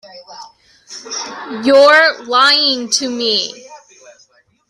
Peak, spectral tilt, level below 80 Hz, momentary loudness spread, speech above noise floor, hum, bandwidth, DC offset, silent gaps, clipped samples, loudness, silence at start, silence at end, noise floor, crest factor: 0 dBFS; -0.5 dB/octave; -64 dBFS; 18 LU; 39 dB; none; 12 kHz; under 0.1%; none; under 0.1%; -12 LUFS; 0.15 s; 0.9 s; -53 dBFS; 16 dB